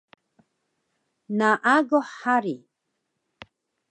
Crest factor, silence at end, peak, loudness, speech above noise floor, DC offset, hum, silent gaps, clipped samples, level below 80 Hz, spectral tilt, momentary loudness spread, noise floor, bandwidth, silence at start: 22 dB; 1.35 s; -6 dBFS; -23 LUFS; 56 dB; under 0.1%; none; none; under 0.1%; -76 dBFS; -5.5 dB/octave; 13 LU; -78 dBFS; 9.4 kHz; 1.3 s